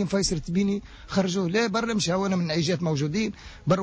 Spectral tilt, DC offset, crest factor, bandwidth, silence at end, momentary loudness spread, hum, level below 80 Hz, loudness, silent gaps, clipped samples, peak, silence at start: -5 dB/octave; under 0.1%; 14 dB; 8 kHz; 0 s; 5 LU; none; -48 dBFS; -26 LUFS; none; under 0.1%; -12 dBFS; 0 s